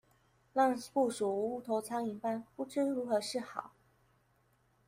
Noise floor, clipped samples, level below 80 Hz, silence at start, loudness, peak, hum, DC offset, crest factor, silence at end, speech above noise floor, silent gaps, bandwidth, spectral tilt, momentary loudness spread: -72 dBFS; under 0.1%; -78 dBFS; 0.55 s; -35 LUFS; -18 dBFS; none; under 0.1%; 18 dB; 1.2 s; 38 dB; none; 16 kHz; -4.5 dB/octave; 8 LU